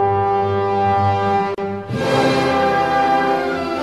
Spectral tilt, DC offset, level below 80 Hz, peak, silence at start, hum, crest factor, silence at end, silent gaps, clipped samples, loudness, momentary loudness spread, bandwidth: -6 dB/octave; 0.2%; -50 dBFS; -4 dBFS; 0 s; none; 12 dB; 0 s; none; under 0.1%; -17 LUFS; 6 LU; 12.5 kHz